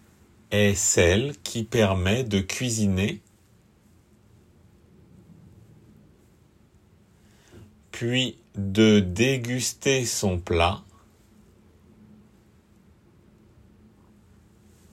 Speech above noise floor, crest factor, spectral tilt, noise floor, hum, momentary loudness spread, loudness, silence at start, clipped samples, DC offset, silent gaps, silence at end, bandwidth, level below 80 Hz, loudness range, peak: 36 dB; 20 dB; -4.5 dB/octave; -58 dBFS; none; 11 LU; -23 LUFS; 0.5 s; under 0.1%; under 0.1%; none; 4.15 s; 16 kHz; -54 dBFS; 10 LU; -6 dBFS